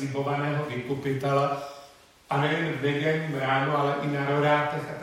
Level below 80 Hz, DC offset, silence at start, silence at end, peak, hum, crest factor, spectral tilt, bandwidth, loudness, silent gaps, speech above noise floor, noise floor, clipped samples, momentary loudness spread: -66 dBFS; under 0.1%; 0 s; 0 s; -10 dBFS; none; 16 dB; -6.5 dB/octave; 14 kHz; -26 LUFS; none; 26 dB; -52 dBFS; under 0.1%; 7 LU